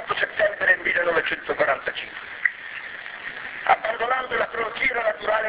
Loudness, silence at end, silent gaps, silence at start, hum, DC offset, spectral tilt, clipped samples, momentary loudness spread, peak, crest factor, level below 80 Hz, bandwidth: -23 LUFS; 0 s; none; 0 s; none; under 0.1%; -6 dB/octave; under 0.1%; 14 LU; -4 dBFS; 20 dB; -58 dBFS; 4 kHz